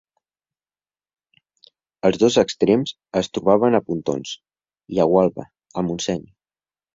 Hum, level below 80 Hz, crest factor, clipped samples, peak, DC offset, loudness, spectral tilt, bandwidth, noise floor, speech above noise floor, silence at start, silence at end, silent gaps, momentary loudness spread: none; -56 dBFS; 20 dB; under 0.1%; -2 dBFS; under 0.1%; -20 LUFS; -5.5 dB/octave; 7.8 kHz; under -90 dBFS; over 71 dB; 2.05 s; 0.75 s; none; 13 LU